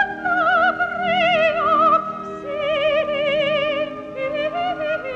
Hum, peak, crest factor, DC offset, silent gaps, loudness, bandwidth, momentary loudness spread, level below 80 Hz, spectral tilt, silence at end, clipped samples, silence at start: none; -6 dBFS; 14 dB; under 0.1%; none; -19 LUFS; 7.8 kHz; 10 LU; -54 dBFS; -5 dB/octave; 0 s; under 0.1%; 0 s